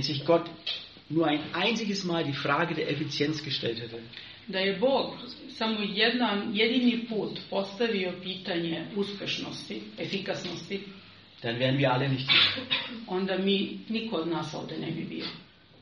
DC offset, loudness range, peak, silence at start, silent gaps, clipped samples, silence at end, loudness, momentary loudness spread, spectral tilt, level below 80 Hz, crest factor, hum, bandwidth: under 0.1%; 6 LU; -8 dBFS; 0 s; none; under 0.1%; 0.35 s; -29 LUFS; 13 LU; -3 dB/octave; -68 dBFS; 22 dB; none; 7.6 kHz